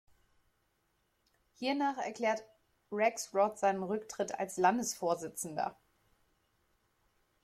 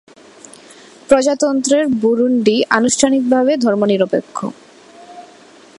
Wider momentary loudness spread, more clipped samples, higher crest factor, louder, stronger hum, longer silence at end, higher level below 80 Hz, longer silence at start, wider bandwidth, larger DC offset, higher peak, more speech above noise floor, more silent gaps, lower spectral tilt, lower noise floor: first, 9 LU vs 6 LU; neither; first, 22 dB vs 16 dB; second, -34 LUFS vs -14 LUFS; neither; first, 1.7 s vs 0.55 s; second, -76 dBFS vs -56 dBFS; first, 1.6 s vs 1.1 s; first, 16 kHz vs 11.5 kHz; neither; second, -14 dBFS vs 0 dBFS; first, 44 dB vs 29 dB; neither; about the same, -3.5 dB/octave vs -4 dB/octave; first, -77 dBFS vs -43 dBFS